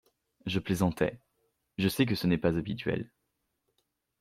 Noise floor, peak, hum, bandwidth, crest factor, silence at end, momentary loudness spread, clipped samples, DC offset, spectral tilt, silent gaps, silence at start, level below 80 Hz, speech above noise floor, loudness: -81 dBFS; -12 dBFS; none; 16 kHz; 20 dB; 1.15 s; 11 LU; under 0.1%; under 0.1%; -6 dB/octave; none; 0.45 s; -56 dBFS; 51 dB; -30 LUFS